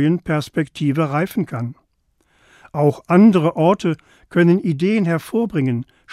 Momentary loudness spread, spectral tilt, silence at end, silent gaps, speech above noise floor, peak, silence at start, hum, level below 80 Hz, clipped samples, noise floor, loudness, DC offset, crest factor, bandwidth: 12 LU; -8 dB/octave; 0 s; none; 47 dB; -2 dBFS; 0 s; none; -56 dBFS; under 0.1%; -64 dBFS; -18 LUFS; under 0.1%; 16 dB; 14.5 kHz